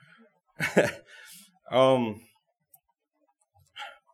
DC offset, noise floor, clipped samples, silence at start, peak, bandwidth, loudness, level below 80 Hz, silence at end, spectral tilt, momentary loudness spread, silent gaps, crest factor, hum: under 0.1%; -75 dBFS; under 0.1%; 0.6 s; -6 dBFS; 15 kHz; -26 LUFS; -74 dBFS; 0.25 s; -5 dB/octave; 26 LU; none; 24 dB; none